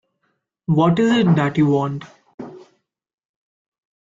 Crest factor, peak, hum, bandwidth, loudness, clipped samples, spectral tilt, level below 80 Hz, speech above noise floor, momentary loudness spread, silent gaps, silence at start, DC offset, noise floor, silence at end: 16 dB; -4 dBFS; none; 7.6 kHz; -17 LUFS; under 0.1%; -7.5 dB/octave; -58 dBFS; 54 dB; 22 LU; 2.34-2.38 s; 0.7 s; under 0.1%; -71 dBFS; 1.45 s